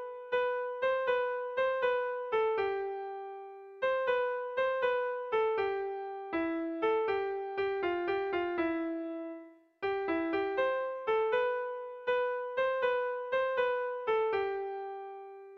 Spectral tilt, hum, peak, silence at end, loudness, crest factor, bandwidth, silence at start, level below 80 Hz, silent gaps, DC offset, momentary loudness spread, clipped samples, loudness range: -6 dB/octave; none; -20 dBFS; 0 s; -33 LUFS; 14 dB; 6 kHz; 0 s; -70 dBFS; none; under 0.1%; 10 LU; under 0.1%; 2 LU